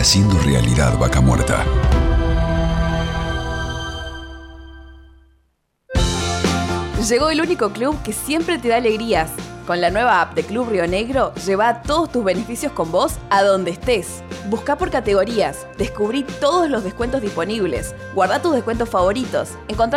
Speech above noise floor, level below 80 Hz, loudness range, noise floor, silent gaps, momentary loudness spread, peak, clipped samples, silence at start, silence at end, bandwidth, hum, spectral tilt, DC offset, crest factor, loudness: 47 dB; -28 dBFS; 5 LU; -65 dBFS; none; 9 LU; -6 dBFS; under 0.1%; 0 s; 0 s; 16 kHz; none; -5 dB/octave; under 0.1%; 14 dB; -19 LUFS